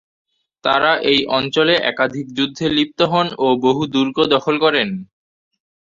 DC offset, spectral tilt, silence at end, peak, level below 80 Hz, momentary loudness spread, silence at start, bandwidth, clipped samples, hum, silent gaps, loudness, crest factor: under 0.1%; -5.5 dB/octave; 0.9 s; -2 dBFS; -56 dBFS; 6 LU; 0.65 s; 7.6 kHz; under 0.1%; none; none; -17 LUFS; 16 dB